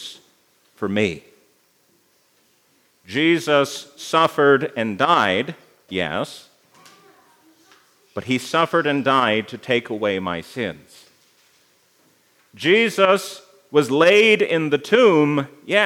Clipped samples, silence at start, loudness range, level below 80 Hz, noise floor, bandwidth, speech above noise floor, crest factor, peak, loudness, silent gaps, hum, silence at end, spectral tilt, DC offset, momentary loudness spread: under 0.1%; 0 s; 10 LU; -68 dBFS; -61 dBFS; 16 kHz; 42 dB; 20 dB; -2 dBFS; -19 LUFS; none; none; 0 s; -4.5 dB/octave; under 0.1%; 15 LU